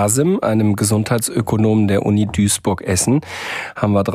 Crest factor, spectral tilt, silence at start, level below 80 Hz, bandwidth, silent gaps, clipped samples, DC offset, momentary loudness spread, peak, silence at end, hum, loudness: 14 dB; -5 dB/octave; 0 s; -44 dBFS; 16 kHz; none; under 0.1%; under 0.1%; 5 LU; -2 dBFS; 0 s; none; -17 LUFS